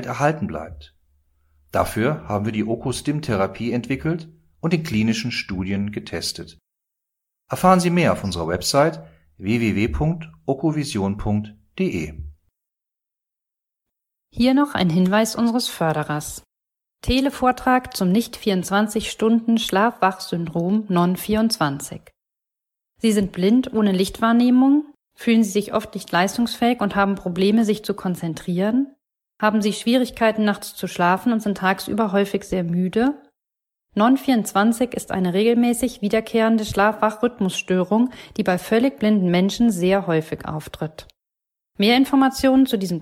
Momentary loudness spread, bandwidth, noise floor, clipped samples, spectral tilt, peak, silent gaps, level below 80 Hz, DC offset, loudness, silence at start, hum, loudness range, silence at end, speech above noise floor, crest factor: 10 LU; 16.5 kHz; -85 dBFS; under 0.1%; -5.5 dB/octave; -2 dBFS; none; -46 dBFS; under 0.1%; -20 LUFS; 0 s; none; 5 LU; 0 s; 65 dB; 18 dB